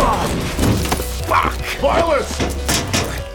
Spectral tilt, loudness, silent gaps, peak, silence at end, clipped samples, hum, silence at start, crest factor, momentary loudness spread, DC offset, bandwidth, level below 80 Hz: -4 dB/octave; -18 LUFS; none; -4 dBFS; 0 s; under 0.1%; none; 0 s; 14 dB; 4 LU; under 0.1%; over 20 kHz; -26 dBFS